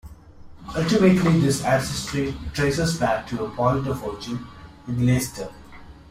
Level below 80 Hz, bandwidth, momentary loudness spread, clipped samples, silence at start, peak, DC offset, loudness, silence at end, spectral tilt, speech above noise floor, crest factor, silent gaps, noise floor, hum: -44 dBFS; 15.5 kHz; 16 LU; under 0.1%; 0.05 s; -6 dBFS; under 0.1%; -22 LUFS; 0.1 s; -6 dB/octave; 21 dB; 18 dB; none; -43 dBFS; none